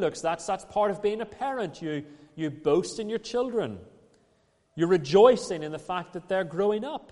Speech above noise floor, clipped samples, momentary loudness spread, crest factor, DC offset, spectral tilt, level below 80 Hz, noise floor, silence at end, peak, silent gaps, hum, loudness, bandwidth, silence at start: 40 dB; under 0.1%; 14 LU; 22 dB; under 0.1%; -5.5 dB/octave; -62 dBFS; -67 dBFS; 0.15 s; -6 dBFS; none; none; -27 LUFS; 11.5 kHz; 0 s